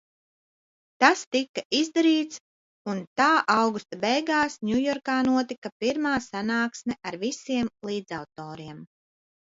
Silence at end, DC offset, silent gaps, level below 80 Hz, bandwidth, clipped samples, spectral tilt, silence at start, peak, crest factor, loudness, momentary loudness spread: 0.7 s; under 0.1%; 1.27-1.31 s, 1.49-1.54 s, 1.65-1.70 s, 2.40-2.85 s, 3.07-3.16 s, 5.58-5.62 s, 5.72-5.80 s; -64 dBFS; 7.8 kHz; under 0.1%; -3.5 dB/octave; 1 s; -2 dBFS; 24 dB; -25 LUFS; 15 LU